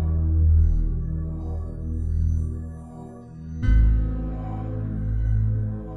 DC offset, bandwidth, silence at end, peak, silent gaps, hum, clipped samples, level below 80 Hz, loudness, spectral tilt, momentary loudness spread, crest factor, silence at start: under 0.1%; 3.2 kHz; 0 s; -10 dBFS; none; none; under 0.1%; -24 dBFS; -25 LUFS; -10 dB/octave; 17 LU; 14 dB; 0 s